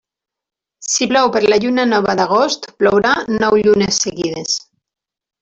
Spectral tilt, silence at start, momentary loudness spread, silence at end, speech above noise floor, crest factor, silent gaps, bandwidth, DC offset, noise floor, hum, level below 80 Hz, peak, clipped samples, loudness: -3 dB/octave; 0.8 s; 7 LU; 0.85 s; 71 dB; 14 dB; none; 8.2 kHz; under 0.1%; -85 dBFS; none; -50 dBFS; -2 dBFS; under 0.1%; -15 LUFS